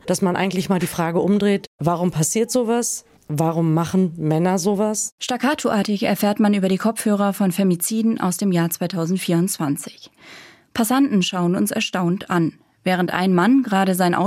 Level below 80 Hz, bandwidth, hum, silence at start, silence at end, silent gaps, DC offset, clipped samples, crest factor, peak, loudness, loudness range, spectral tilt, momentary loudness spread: -60 dBFS; 16.5 kHz; none; 0.05 s; 0 s; 1.67-1.79 s, 5.12-5.18 s; under 0.1%; under 0.1%; 16 dB; -4 dBFS; -20 LUFS; 2 LU; -5 dB/octave; 6 LU